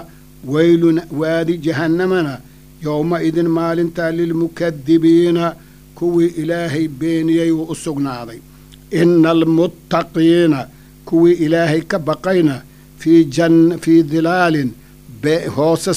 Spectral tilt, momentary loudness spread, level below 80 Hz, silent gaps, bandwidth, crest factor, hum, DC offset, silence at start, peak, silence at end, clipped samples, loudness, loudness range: -6.5 dB/octave; 10 LU; -48 dBFS; none; 15 kHz; 14 dB; none; under 0.1%; 0 s; 0 dBFS; 0 s; under 0.1%; -15 LUFS; 4 LU